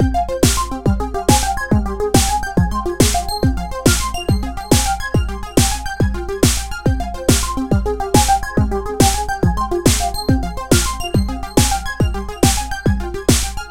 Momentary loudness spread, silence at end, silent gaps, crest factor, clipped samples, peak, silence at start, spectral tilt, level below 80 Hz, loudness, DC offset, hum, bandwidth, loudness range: 5 LU; 0 s; none; 16 dB; under 0.1%; 0 dBFS; 0 s; -4.5 dB/octave; -22 dBFS; -17 LUFS; under 0.1%; none; 17 kHz; 1 LU